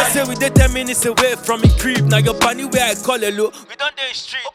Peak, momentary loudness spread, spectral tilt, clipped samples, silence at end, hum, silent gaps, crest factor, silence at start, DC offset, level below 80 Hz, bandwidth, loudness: 0 dBFS; 9 LU; -4 dB/octave; under 0.1%; 0.05 s; none; none; 16 dB; 0 s; under 0.1%; -26 dBFS; 16.5 kHz; -16 LUFS